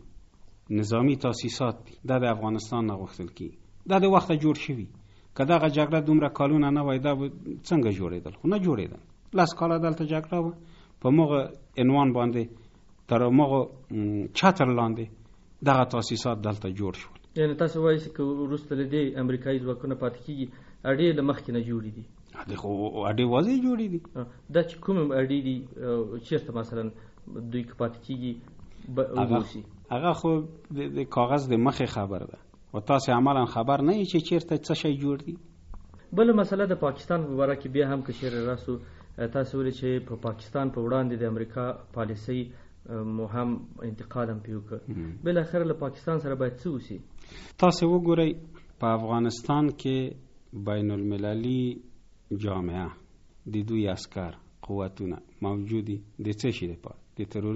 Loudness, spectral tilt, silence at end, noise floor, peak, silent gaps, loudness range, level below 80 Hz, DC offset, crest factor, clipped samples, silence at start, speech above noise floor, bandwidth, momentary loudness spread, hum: -27 LUFS; -6.5 dB/octave; 0 s; -51 dBFS; -6 dBFS; none; 7 LU; -54 dBFS; under 0.1%; 22 dB; under 0.1%; 0.05 s; 25 dB; 8 kHz; 15 LU; none